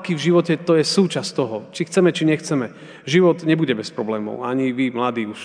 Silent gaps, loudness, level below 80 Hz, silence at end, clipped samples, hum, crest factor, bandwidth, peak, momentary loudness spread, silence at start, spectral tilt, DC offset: none; -20 LUFS; -70 dBFS; 0 s; under 0.1%; none; 16 dB; 10 kHz; -4 dBFS; 9 LU; 0 s; -5.5 dB/octave; under 0.1%